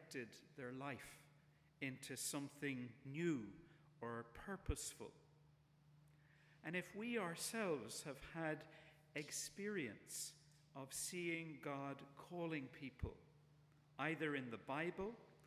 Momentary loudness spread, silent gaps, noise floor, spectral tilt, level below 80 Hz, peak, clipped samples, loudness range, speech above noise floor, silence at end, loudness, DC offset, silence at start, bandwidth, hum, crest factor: 13 LU; none; -72 dBFS; -4 dB/octave; -64 dBFS; -28 dBFS; under 0.1%; 3 LU; 24 dB; 0 s; -48 LUFS; under 0.1%; 0 s; 16 kHz; none; 22 dB